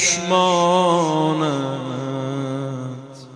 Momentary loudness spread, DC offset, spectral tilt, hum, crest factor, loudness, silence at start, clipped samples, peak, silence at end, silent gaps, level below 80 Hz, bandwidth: 13 LU; under 0.1%; -4 dB/octave; none; 16 dB; -19 LUFS; 0 s; under 0.1%; -4 dBFS; 0 s; none; -64 dBFS; 11 kHz